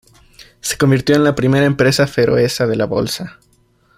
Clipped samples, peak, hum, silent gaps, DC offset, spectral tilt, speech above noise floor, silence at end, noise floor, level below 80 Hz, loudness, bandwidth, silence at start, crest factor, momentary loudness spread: under 0.1%; -2 dBFS; none; none; under 0.1%; -5.5 dB/octave; 41 dB; 0.65 s; -55 dBFS; -44 dBFS; -15 LUFS; 16 kHz; 0.4 s; 14 dB; 10 LU